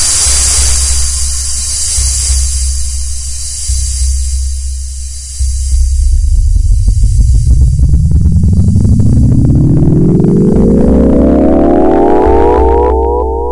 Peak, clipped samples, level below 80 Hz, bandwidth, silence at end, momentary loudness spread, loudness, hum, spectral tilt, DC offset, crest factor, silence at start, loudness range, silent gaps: 0 dBFS; 0.5%; -12 dBFS; 11.5 kHz; 0 s; 9 LU; -9 LUFS; none; -5.5 dB/octave; under 0.1%; 8 dB; 0 s; 7 LU; none